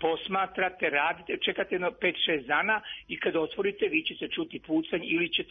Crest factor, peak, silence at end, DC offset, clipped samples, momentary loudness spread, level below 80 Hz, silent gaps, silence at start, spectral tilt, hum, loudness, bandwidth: 18 dB; -12 dBFS; 0.05 s; under 0.1%; under 0.1%; 6 LU; -64 dBFS; none; 0 s; -7.5 dB/octave; none; -29 LUFS; 4.9 kHz